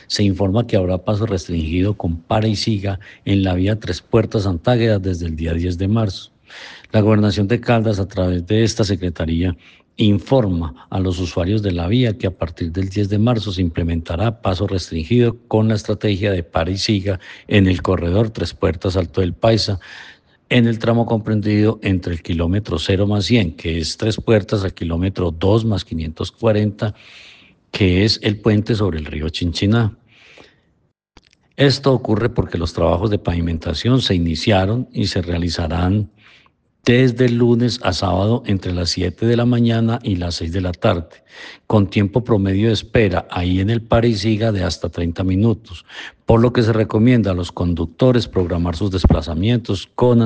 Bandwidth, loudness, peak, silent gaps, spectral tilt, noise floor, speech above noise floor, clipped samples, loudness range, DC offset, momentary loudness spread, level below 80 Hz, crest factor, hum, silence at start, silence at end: 9.2 kHz; -18 LUFS; 0 dBFS; none; -7 dB/octave; -63 dBFS; 46 dB; under 0.1%; 2 LU; under 0.1%; 8 LU; -36 dBFS; 18 dB; none; 0.1 s; 0 s